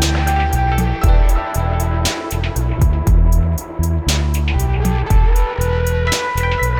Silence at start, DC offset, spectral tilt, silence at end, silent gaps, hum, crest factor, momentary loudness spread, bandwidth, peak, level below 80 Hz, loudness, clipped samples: 0 s; under 0.1%; -5 dB/octave; 0 s; none; none; 12 dB; 5 LU; 18.5 kHz; -2 dBFS; -16 dBFS; -17 LUFS; under 0.1%